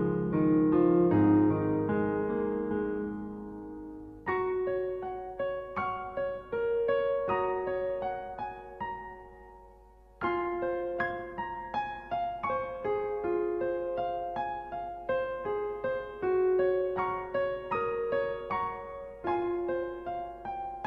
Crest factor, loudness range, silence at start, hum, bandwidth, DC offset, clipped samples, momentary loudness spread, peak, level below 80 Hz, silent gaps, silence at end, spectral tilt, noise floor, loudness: 18 dB; 7 LU; 0 s; none; 5.4 kHz; under 0.1%; under 0.1%; 13 LU; -14 dBFS; -56 dBFS; none; 0 s; -9.5 dB/octave; -56 dBFS; -31 LUFS